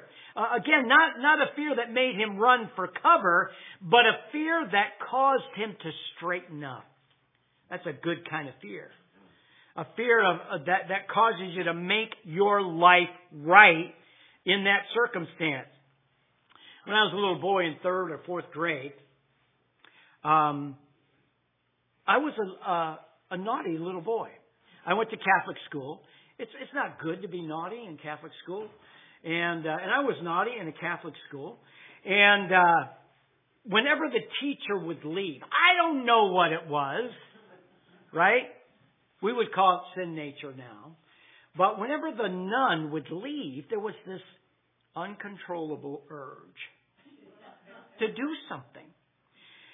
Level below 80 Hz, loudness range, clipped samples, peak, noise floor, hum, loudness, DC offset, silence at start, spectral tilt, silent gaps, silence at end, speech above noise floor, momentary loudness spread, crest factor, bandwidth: -88 dBFS; 14 LU; under 0.1%; -2 dBFS; -74 dBFS; none; -26 LUFS; under 0.1%; 0 s; -8 dB/octave; none; 0.95 s; 47 dB; 21 LU; 26 dB; 3.9 kHz